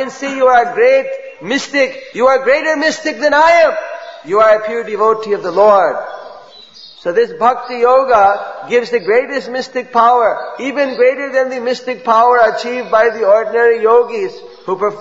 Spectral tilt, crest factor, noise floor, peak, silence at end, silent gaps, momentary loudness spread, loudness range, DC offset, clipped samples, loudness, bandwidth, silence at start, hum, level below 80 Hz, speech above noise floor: -3.5 dB/octave; 12 dB; -38 dBFS; 0 dBFS; 0 s; none; 11 LU; 2 LU; 0.3%; under 0.1%; -13 LUFS; 8 kHz; 0 s; none; -56 dBFS; 26 dB